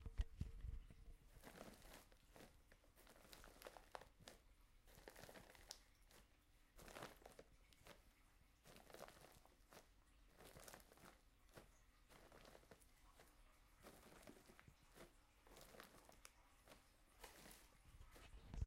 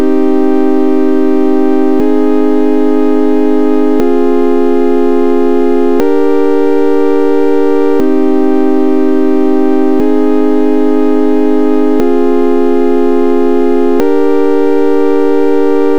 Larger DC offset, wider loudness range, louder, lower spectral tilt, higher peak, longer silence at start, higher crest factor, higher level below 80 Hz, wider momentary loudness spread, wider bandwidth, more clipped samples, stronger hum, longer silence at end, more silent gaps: second, under 0.1% vs 30%; first, 4 LU vs 0 LU; second, -63 LUFS vs -10 LUFS; second, -4.5 dB/octave vs -7 dB/octave; second, -32 dBFS vs 0 dBFS; about the same, 0 s vs 0 s; first, 28 dB vs 10 dB; second, -64 dBFS vs -54 dBFS; first, 10 LU vs 0 LU; first, 16 kHz vs 9.2 kHz; neither; neither; about the same, 0 s vs 0 s; neither